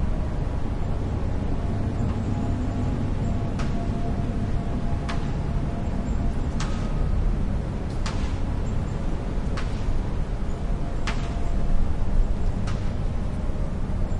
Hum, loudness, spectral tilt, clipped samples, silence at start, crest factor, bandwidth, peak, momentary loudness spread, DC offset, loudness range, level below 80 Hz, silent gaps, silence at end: none; -28 LUFS; -7.5 dB/octave; under 0.1%; 0 s; 16 dB; 9.6 kHz; -8 dBFS; 3 LU; under 0.1%; 2 LU; -26 dBFS; none; 0 s